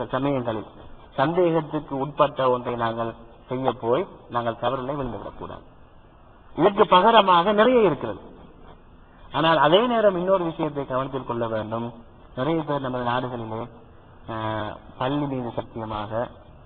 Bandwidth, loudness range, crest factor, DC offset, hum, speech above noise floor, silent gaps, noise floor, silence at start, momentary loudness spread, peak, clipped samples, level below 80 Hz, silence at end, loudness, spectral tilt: 4.6 kHz; 9 LU; 22 dB; under 0.1%; none; 27 dB; none; -49 dBFS; 0 s; 17 LU; -2 dBFS; under 0.1%; -50 dBFS; 0.1 s; -23 LUFS; -10.5 dB/octave